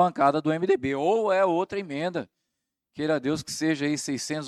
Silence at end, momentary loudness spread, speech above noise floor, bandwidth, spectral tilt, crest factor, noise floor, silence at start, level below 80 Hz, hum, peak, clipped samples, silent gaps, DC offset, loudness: 0 s; 9 LU; 58 dB; 13.5 kHz; -5 dB/octave; 18 dB; -83 dBFS; 0 s; -66 dBFS; none; -8 dBFS; under 0.1%; none; under 0.1%; -26 LUFS